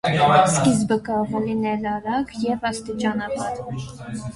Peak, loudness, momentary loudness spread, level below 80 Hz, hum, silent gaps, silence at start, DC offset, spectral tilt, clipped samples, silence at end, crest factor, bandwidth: -2 dBFS; -21 LUFS; 15 LU; -50 dBFS; none; none; 0.05 s; under 0.1%; -5 dB/octave; under 0.1%; 0 s; 18 dB; 11.5 kHz